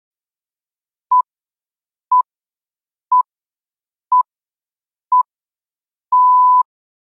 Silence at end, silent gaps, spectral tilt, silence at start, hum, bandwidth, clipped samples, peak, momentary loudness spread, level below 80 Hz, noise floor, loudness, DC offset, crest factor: 0.4 s; none; -2.5 dB/octave; 1.1 s; none; 1.3 kHz; under 0.1%; -6 dBFS; 15 LU; under -90 dBFS; under -90 dBFS; -15 LUFS; under 0.1%; 12 dB